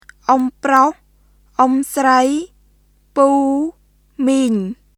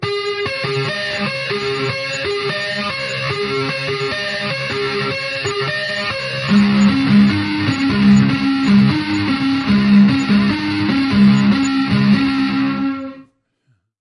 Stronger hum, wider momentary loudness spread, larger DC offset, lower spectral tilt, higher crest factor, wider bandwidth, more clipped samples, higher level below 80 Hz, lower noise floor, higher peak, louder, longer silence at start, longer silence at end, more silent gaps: first, 50 Hz at -55 dBFS vs none; first, 11 LU vs 8 LU; neither; second, -4.5 dB/octave vs -6 dB/octave; about the same, 16 dB vs 14 dB; first, 14.5 kHz vs 10.5 kHz; neither; second, -54 dBFS vs -46 dBFS; second, -54 dBFS vs -63 dBFS; about the same, 0 dBFS vs -2 dBFS; about the same, -16 LUFS vs -16 LUFS; first, 0.3 s vs 0 s; second, 0.25 s vs 0.8 s; neither